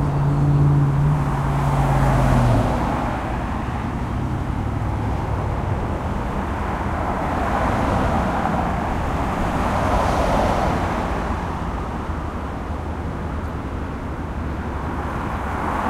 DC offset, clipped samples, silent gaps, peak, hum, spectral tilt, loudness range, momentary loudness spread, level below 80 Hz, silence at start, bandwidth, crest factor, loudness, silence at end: under 0.1%; under 0.1%; none; -4 dBFS; none; -7.5 dB/octave; 8 LU; 10 LU; -28 dBFS; 0 s; 13.5 kHz; 18 dB; -22 LUFS; 0 s